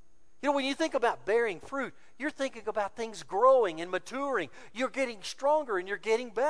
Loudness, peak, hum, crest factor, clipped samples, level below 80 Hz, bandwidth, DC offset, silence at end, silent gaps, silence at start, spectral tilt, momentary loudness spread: -31 LUFS; -12 dBFS; none; 18 dB; under 0.1%; -68 dBFS; 11 kHz; 0.4%; 0 s; none; 0.45 s; -3.5 dB/octave; 11 LU